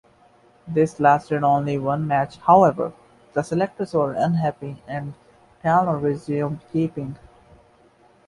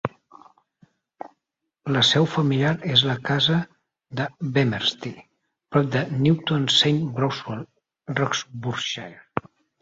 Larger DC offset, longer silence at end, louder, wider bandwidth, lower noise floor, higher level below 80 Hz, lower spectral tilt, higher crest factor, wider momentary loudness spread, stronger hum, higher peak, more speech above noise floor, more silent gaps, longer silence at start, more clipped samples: neither; first, 1.1 s vs 0.4 s; about the same, -21 LUFS vs -22 LUFS; first, 11.5 kHz vs 8 kHz; second, -55 dBFS vs -81 dBFS; about the same, -56 dBFS vs -60 dBFS; first, -8 dB/octave vs -5 dB/octave; about the same, 20 dB vs 22 dB; second, 15 LU vs 19 LU; neither; about the same, -2 dBFS vs -2 dBFS; second, 35 dB vs 59 dB; neither; first, 0.65 s vs 0.05 s; neither